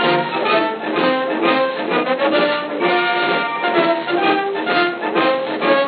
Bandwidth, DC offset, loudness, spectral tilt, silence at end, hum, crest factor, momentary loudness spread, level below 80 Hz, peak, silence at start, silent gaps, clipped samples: 5.2 kHz; under 0.1%; -17 LUFS; -1.5 dB/octave; 0 s; none; 16 dB; 3 LU; under -90 dBFS; -2 dBFS; 0 s; none; under 0.1%